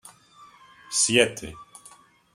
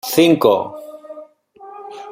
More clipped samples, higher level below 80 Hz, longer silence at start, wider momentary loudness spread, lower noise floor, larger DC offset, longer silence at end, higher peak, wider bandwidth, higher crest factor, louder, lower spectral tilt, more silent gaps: neither; about the same, -60 dBFS vs -62 dBFS; about the same, 0.05 s vs 0.05 s; second, 22 LU vs 25 LU; first, -53 dBFS vs -41 dBFS; neither; first, 0.7 s vs 0 s; about the same, -2 dBFS vs 0 dBFS; about the same, 16 kHz vs 16 kHz; first, 26 dB vs 18 dB; second, -21 LUFS vs -14 LUFS; second, -2 dB/octave vs -5 dB/octave; neither